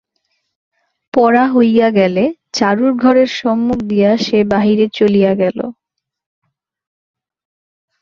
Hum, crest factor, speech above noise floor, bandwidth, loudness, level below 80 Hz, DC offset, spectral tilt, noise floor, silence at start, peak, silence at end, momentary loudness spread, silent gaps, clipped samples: none; 14 dB; 56 dB; 7.2 kHz; -13 LUFS; -52 dBFS; under 0.1%; -6 dB/octave; -68 dBFS; 1.15 s; -2 dBFS; 2.3 s; 6 LU; none; under 0.1%